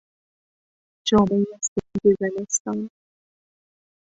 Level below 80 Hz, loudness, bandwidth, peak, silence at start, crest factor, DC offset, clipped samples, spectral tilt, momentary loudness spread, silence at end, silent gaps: -52 dBFS; -22 LUFS; 8 kHz; -6 dBFS; 1.05 s; 18 dB; under 0.1%; under 0.1%; -4.5 dB/octave; 11 LU; 1.15 s; 1.68-1.76 s, 2.60-2.65 s